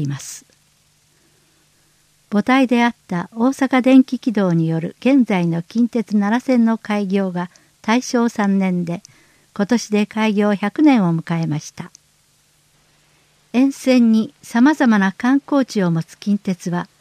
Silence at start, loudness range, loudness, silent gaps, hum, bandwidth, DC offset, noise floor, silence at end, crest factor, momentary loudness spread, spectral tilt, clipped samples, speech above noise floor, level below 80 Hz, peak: 0 s; 4 LU; -17 LUFS; none; none; 14.5 kHz; under 0.1%; -58 dBFS; 0.15 s; 16 dB; 12 LU; -6.5 dB/octave; under 0.1%; 41 dB; -66 dBFS; -2 dBFS